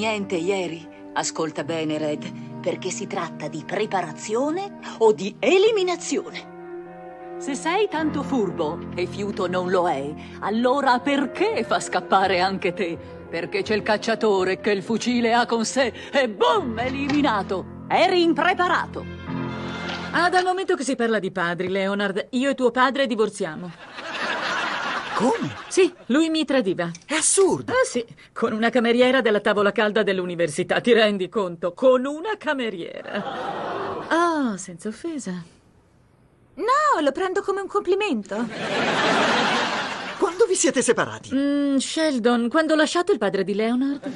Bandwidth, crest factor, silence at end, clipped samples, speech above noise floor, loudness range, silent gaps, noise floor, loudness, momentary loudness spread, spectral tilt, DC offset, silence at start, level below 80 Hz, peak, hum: 11.5 kHz; 16 dB; 0 s; under 0.1%; 35 dB; 6 LU; none; -57 dBFS; -22 LUFS; 11 LU; -4 dB/octave; under 0.1%; 0 s; -60 dBFS; -6 dBFS; none